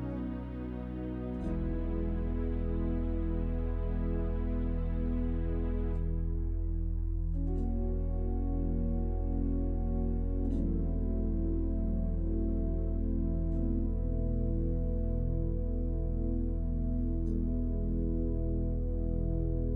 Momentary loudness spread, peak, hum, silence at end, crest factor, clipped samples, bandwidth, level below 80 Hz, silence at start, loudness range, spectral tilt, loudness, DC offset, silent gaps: 2 LU; -20 dBFS; none; 0 s; 10 dB; under 0.1%; 2.8 kHz; -32 dBFS; 0 s; 1 LU; -12 dB/octave; -35 LUFS; under 0.1%; none